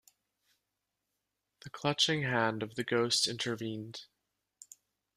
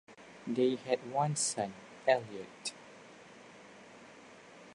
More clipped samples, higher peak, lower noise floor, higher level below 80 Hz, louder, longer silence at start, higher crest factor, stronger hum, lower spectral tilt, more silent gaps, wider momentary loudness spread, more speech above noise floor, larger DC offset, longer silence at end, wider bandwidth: neither; about the same, -14 dBFS vs -14 dBFS; first, -86 dBFS vs -55 dBFS; first, -74 dBFS vs -80 dBFS; about the same, -32 LUFS vs -34 LUFS; first, 1.65 s vs 0.1 s; about the same, 22 dB vs 22 dB; neither; about the same, -3.5 dB/octave vs -4 dB/octave; neither; second, 16 LU vs 23 LU; first, 53 dB vs 22 dB; neither; first, 1.1 s vs 0 s; first, 15 kHz vs 11 kHz